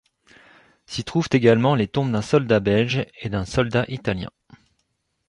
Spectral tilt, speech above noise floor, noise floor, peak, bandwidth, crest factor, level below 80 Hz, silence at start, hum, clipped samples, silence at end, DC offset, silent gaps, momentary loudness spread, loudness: -6.5 dB/octave; 52 dB; -72 dBFS; -4 dBFS; 11 kHz; 18 dB; -46 dBFS; 0.9 s; none; under 0.1%; 1 s; under 0.1%; none; 12 LU; -21 LUFS